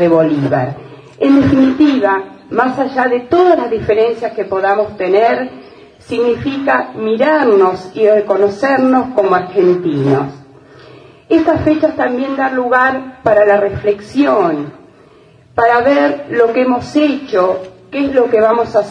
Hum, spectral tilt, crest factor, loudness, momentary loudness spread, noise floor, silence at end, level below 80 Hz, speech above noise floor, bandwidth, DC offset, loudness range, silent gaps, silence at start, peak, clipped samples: none; -7.5 dB/octave; 12 dB; -13 LUFS; 7 LU; -44 dBFS; 0 s; -48 dBFS; 32 dB; 9.4 kHz; under 0.1%; 3 LU; none; 0 s; 0 dBFS; under 0.1%